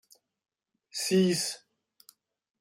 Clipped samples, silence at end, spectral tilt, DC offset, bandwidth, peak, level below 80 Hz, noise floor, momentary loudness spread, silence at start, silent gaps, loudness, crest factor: under 0.1%; 1.05 s; -4.5 dB/octave; under 0.1%; 16 kHz; -14 dBFS; -74 dBFS; -63 dBFS; 15 LU; 0.95 s; none; -28 LUFS; 18 dB